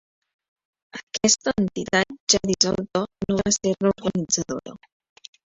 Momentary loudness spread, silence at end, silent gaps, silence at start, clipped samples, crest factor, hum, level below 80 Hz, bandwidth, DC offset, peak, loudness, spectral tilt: 13 LU; 0.75 s; 1.03-1.07 s, 2.20-2.27 s; 0.95 s; under 0.1%; 24 dB; none; -52 dBFS; 8.2 kHz; under 0.1%; -2 dBFS; -22 LUFS; -3 dB/octave